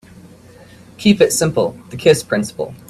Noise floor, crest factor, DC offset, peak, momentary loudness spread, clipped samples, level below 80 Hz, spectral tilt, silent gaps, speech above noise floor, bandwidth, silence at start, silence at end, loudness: -42 dBFS; 18 dB; under 0.1%; 0 dBFS; 8 LU; under 0.1%; -52 dBFS; -4.5 dB/octave; none; 27 dB; 15.5 kHz; 0.25 s; 0.15 s; -16 LUFS